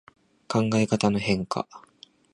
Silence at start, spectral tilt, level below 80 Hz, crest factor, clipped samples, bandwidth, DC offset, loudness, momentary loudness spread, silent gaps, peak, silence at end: 0.5 s; -6 dB/octave; -56 dBFS; 20 dB; under 0.1%; 11 kHz; under 0.1%; -25 LUFS; 9 LU; none; -6 dBFS; 0.55 s